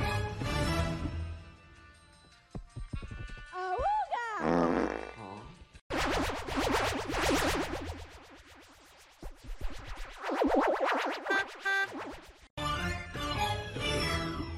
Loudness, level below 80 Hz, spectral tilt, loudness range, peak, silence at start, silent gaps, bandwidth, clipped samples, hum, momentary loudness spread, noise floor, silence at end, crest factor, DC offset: -32 LUFS; -44 dBFS; -4.5 dB/octave; 6 LU; -14 dBFS; 0 s; 5.81-5.90 s, 12.50-12.57 s; 16 kHz; under 0.1%; none; 20 LU; -59 dBFS; 0 s; 20 dB; under 0.1%